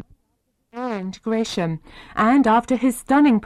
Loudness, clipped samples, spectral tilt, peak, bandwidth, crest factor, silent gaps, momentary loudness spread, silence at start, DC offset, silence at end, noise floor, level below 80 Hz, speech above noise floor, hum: -20 LUFS; under 0.1%; -5.5 dB/octave; -8 dBFS; 13.5 kHz; 12 dB; none; 15 LU; 0.75 s; under 0.1%; 0 s; -70 dBFS; -52 dBFS; 51 dB; none